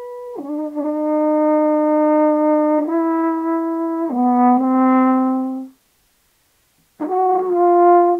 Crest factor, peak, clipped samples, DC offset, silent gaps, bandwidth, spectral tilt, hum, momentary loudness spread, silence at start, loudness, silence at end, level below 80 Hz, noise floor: 12 dB; -4 dBFS; under 0.1%; under 0.1%; none; 3.3 kHz; -8 dB/octave; none; 12 LU; 0 s; -17 LUFS; 0 s; -74 dBFS; -61 dBFS